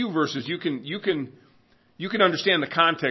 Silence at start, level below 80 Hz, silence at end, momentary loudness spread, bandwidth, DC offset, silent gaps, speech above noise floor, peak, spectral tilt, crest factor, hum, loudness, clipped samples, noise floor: 0 s; -72 dBFS; 0 s; 10 LU; 6.2 kHz; under 0.1%; none; 36 dB; -4 dBFS; -5 dB/octave; 20 dB; none; -24 LUFS; under 0.1%; -60 dBFS